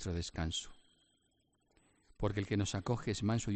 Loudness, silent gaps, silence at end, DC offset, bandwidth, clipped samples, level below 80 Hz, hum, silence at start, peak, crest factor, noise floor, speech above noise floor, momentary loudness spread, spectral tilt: -38 LUFS; none; 0 s; under 0.1%; 8.8 kHz; under 0.1%; -54 dBFS; none; 0 s; -22 dBFS; 18 dB; -77 dBFS; 41 dB; 5 LU; -5 dB/octave